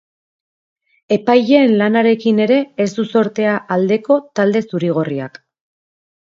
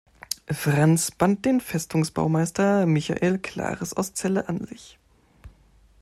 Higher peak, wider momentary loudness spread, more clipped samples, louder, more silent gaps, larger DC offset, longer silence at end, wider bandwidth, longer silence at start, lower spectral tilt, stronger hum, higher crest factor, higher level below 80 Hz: first, 0 dBFS vs -6 dBFS; second, 8 LU vs 11 LU; neither; first, -15 LUFS vs -24 LUFS; neither; neither; first, 1.1 s vs 0.5 s; second, 7.6 kHz vs 14.5 kHz; first, 1.1 s vs 0.3 s; first, -7 dB/octave vs -5.5 dB/octave; neither; about the same, 16 dB vs 18 dB; second, -64 dBFS vs -54 dBFS